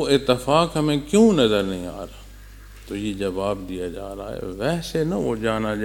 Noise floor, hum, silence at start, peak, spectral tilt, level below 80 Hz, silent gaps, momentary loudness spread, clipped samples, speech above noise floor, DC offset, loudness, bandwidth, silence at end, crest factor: -42 dBFS; none; 0 s; -2 dBFS; -5.5 dB/octave; -42 dBFS; none; 16 LU; under 0.1%; 20 dB; under 0.1%; -22 LUFS; 17.5 kHz; 0 s; 20 dB